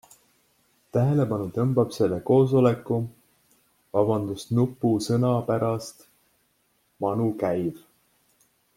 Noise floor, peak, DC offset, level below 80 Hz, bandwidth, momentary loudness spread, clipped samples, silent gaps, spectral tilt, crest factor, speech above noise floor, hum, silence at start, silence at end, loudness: -69 dBFS; -6 dBFS; under 0.1%; -60 dBFS; 16 kHz; 8 LU; under 0.1%; none; -8 dB/octave; 20 dB; 45 dB; none; 0.95 s; 1 s; -24 LUFS